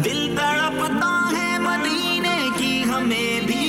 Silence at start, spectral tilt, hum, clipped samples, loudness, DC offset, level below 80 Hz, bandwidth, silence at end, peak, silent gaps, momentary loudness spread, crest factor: 0 s; -3.5 dB/octave; none; under 0.1%; -20 LUFS; under 0.1%; -52 dBFS; 16 kHz; 0 s; -12 dBFS; none; 1 LU; 10 dB